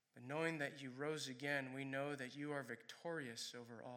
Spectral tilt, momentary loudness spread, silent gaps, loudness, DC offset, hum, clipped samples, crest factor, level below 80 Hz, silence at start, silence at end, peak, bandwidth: -4.5 dB/octave; 7 LU; none; -46 LUFS; under 0.1%; none; under 0.1%; 18 dB; under -90 dBFS; 0.15 s; 0 s; -28 dBFS; 17 kHz